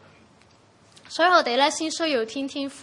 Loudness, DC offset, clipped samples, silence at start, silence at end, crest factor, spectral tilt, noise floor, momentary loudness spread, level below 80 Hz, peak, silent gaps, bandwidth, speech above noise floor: -22 LUFS; under 0.1%; under 0.1%; 1.1 s; 0 s; 20 dB; -1.5 dB/octave; -56 dBFS; 12 LU; -74 dBFS; -6 dBFS; none; 11.5 kHz; 33 dB